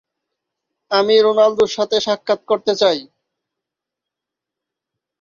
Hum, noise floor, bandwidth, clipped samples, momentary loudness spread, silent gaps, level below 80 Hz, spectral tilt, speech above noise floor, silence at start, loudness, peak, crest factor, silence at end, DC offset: none; -84 dBFS; 7.4 kHz; under 0.1%; 7 LU; none; -64 dBFS; -3.5 dB/octave; 69 dB; 0.9 s; -16 LUFS; -2 dBFS; 18 dB; 2.2 s; under 0.1%